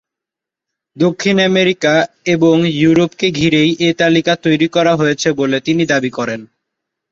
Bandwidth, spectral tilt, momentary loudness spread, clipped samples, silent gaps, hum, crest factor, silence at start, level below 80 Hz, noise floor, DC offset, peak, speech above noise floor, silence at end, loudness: 7.6 kHz; -5.5 dB/octave; 5 LU; under 0.1%; none; none; 14 dB; 0.95 s; -52 dBFS; -85 dBFS; under 0.1%; 0 dBFS; 71 dB; 0.65 s; -13 LUFS